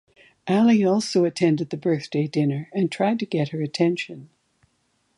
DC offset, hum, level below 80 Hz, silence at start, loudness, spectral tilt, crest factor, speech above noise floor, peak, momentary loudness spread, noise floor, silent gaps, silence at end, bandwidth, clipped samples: under 0.1%; none; -70 dBFS; 0.45 s; -22 LUFS; -6.5 dB/octave; 16 dB; 47 dB; -6 dBFS; 9 LU; -69 dBFS; none; 0.95 s; 11.5 kHz; under 0.1%